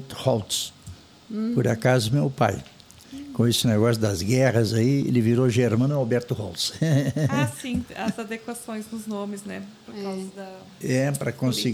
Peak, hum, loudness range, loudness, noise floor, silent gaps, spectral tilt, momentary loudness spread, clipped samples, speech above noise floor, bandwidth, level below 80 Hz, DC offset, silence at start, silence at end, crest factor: -6 dBFS; none; 9 LU; -24 LUFS; -44 dBFS; none; -5.5 dB/octave; 15 LU; under 0.1%; 21 dB; 19 kHz; -56 dBFS; under 0.1%; 0 s; 0 s; 18 dB